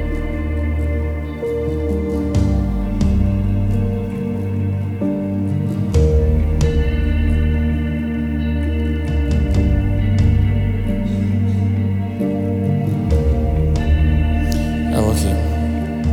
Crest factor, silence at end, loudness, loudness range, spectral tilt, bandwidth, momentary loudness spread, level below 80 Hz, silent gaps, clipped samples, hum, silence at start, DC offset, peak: 14 dB; 0 s; -19 LUFS; 2 LU; -8 dB/octave; 14.5 kHz; 5 LU; -22 dBFS; none; under 0.1%; none; 0 s; under 0.1%; -2 dBFS